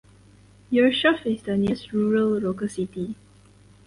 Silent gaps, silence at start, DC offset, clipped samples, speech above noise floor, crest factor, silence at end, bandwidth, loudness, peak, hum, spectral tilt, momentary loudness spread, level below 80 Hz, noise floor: none; 0.7 s; under 0.1%; under 0.1%; 30 dB; 18 dB; 0.7 s; 11.5 kHz; -23 LUFS; -6 dBFS; 50 Hz at -40 dBFS; -6 dB/octave; 12 LU; -56 dBFS; -53 dBFS